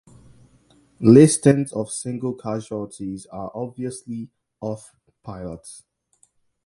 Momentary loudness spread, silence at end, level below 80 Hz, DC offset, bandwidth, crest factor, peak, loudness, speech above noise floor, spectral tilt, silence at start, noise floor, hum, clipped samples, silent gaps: 24 LU; 0.9 s; -56 dBFS; under 0.1%; 11.5 kHz; 22 dB; 0 dBFS; -20 LUFS; 43 dB; -6.5 dB/octave; 1 s; -63 dBFS; none; under 0.1%; none